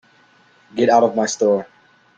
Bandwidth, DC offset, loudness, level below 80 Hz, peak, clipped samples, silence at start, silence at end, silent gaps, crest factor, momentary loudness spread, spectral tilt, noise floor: 9.2 kHz; under 0.1%; -17 LUFS; -64 dBFS; -2 dBFS; under 0.1%; 0.75 s; 0.55 s; none; 18 dB; 8 LU; -4 dB/octave; -54 dBFS